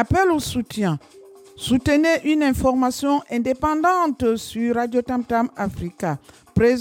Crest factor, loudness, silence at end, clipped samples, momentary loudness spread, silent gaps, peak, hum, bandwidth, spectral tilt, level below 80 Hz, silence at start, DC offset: 16 dB; -21 LUFS; 0 s; under 0.1%; 9 LU; none; -6 dBFS; none; 17 kHz; -5.5 dB/octave; -42 dBFS; 0 s; under 0.1%